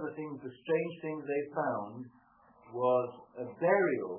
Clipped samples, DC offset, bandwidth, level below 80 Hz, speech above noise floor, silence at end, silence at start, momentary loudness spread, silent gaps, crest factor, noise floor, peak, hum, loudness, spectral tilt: under 0.1%; under 0.1%; 3.3 kHz; -80 dBFS; 29 dB; 0 s; 0 s; 16 LU; none; 18 dB; -62 dBFS; -14 dBFS; none; -33 LUFS; -2 dB/octave